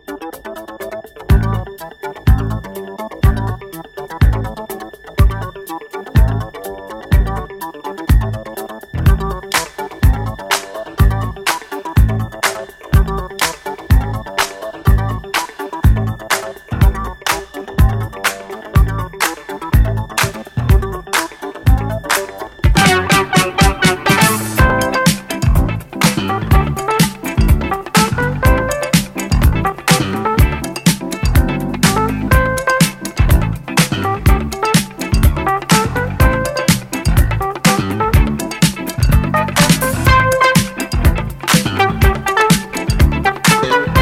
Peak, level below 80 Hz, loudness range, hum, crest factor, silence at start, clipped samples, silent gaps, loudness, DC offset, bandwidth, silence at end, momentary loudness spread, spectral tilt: 0 dBFS; -20 dBFS; 6 LU; none; 14 dB; 0.1 s; under 0.1%; none; -15 LUFS; under 0.1%; 16.5 kHz; 0 s; 13 LU; -4.5 dB/octave